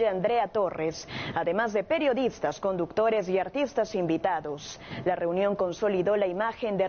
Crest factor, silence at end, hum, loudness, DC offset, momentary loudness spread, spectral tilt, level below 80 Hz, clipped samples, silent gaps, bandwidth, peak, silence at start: 14 dB; 0 s; none; -28 LUFS; under 0.1%; 7 LU; -4.5 dB/octave; -58 dBFS; under 0.1%; none; 6.8 kHz; -12 dBFS; 0 s